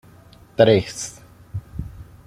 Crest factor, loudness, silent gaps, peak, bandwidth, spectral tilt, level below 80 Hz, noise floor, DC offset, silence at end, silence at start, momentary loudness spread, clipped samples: 22 dB; -18 LUFS; none; 0 dBFS; 15.5 kHz; -5 dB/octave; -44 dBFS; -48 dBFS; under 0.1%; 0.25 s; 0.6 s; 20 LU; under 0.1%